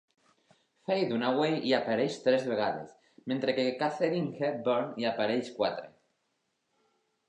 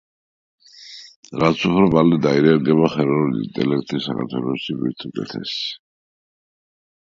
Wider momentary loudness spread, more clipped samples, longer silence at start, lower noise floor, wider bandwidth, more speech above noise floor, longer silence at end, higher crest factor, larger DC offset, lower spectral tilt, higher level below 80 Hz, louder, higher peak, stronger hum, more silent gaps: second, 8 LU vs 17 LU; neither; about the same, 0.9 s vs 0.8 s; first, -79 dBFS vs -41 dBFS; first, 9.6 kHz vs 7.4 kHz; first, 49 dB vs 23 dB; first, 1.4 s vs 1.25 s; about the same, 18 dB vs 20 dB; neither; about the same, -6 dB/octave vs -7 dB/octave; second, -80 dBFS vs -52 dBFS; second, -30 LUFS vs -19 LUFS; second, -14 dBFS vs 0 dBFS; neither; second, none vs 1.16-1.23 s